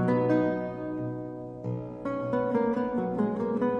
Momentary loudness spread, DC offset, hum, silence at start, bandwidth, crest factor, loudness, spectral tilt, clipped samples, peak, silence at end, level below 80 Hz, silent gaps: 10 LU; under 0.1%; none; 0 s; 7 kHz; 14 dB; -30 LUFS; -10 dB/octave; under 0.1%; -14 dBFS; 0 s; -58 dBFS; none